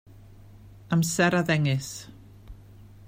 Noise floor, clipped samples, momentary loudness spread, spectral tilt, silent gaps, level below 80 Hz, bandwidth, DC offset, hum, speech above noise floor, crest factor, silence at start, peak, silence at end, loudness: -49 dBFS; under 0.1%; 17 LU; -5 dB/octave; none; -54 dBFS; 16 kHz; under 0.1%; none; 24 dB; 20 dB; 0.15 s; -8 dBFS; 0 s; -24 LUFS